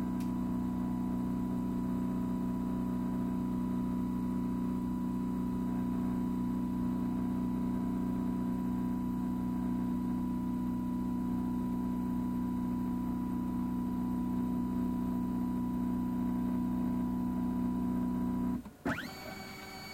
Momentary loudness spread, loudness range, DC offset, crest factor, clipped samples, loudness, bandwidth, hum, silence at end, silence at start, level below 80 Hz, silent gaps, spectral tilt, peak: 1 LU; 1 LU; under 0.1%; 10 dB; under 0.1%; -35 LUFS; 16 kHz; none; 0 s; 0 s; -50 dBFS; none; -8 dB/octave; -24 dBFS